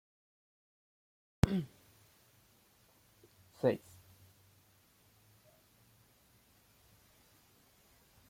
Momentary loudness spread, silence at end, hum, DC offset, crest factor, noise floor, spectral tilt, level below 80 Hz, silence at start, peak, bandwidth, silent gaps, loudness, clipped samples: 29 LU; 4.5 s; none; under 0.1%; 34 dB; -68 dBFS; -7 dB/octave; -58 dBFS; 1.45 s; -10 dBFS; 16.5 kHz; none; -36 LUFS; under 0.1%